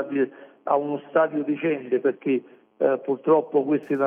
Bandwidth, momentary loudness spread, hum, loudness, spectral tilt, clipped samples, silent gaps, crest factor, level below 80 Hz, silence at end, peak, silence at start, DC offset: 3.6 kHz; 6 LU; none; -24 LUFS; -9 dB/octave; under 0.1%; none; 16 dB; -80 dBFS; 0 s; -8 dBFS; 0 s; under 0.1%